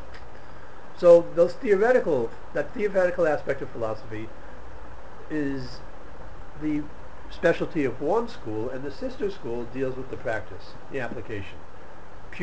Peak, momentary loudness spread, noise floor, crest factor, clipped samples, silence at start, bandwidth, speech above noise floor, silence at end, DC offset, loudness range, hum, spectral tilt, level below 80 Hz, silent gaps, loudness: -6 dBFS; 24 LU; -45 dBFS; 22 dB; under 0.1%; 0 s; 8.4 kHz; 20 dB; 0 s; 3%; 12 LU; none; -7 dB/octave; -48 dBFS; none; -26 LUFS